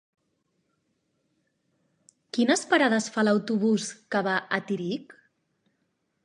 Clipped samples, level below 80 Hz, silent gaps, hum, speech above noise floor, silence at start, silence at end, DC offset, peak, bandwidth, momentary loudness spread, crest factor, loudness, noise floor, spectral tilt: under 0.1%; -80 dBFS; none; none; 50 dB; 2.35 s; 1.1 s; under 0.1%; -8 dBFS; 11 kHz; 9 LU; 20 dB; -26 LUFS; -75 dBFS; -4 dB/octave